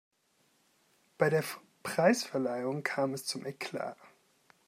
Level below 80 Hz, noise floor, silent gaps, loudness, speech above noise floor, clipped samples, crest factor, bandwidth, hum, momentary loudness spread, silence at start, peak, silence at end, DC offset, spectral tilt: -82 dBFS; -72 dBFS; none; -33 LUFS; 40 dB; under 0.1%; 22 dB; 16 kHz; none; 13 LU; 1.2 s; -12 dBFS; 0.6 s; under 0.1%; -4.5 dB/octave